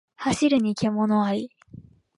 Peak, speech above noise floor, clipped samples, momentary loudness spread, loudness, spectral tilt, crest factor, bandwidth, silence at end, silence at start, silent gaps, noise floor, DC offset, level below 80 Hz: -10 dBFS; 25 dB; under 0.1%; 8 LU; -23 LUFS; -5.5 dB/octave; 14 dB; 11.5 kHz; 0.35 s; 0.2 s; none; -47 dBFS; under 0.1%; -58 dBFS